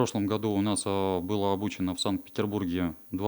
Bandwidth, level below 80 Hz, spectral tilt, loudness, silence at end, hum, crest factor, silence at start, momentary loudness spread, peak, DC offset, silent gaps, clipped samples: over 20 kHz; -64 dBFS; -5.5 dB/octave; -29 LUFS; 0 s; none; 18 dB; 0 s; 4 LU; -10 dBFS; under 0.1%; none; under 0.1%